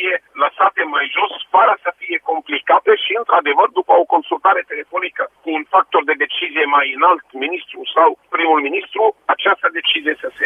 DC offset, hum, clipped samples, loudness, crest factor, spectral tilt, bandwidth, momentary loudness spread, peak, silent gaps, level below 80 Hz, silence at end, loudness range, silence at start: under 0.1%; none; under 0.1%; -16 LUFS; 16 dB; -3.5 dB/octave; 4 kHz; 9 LU; 0 dBFS; none; -72 dBFS; 0 s; 2 LU; 0 s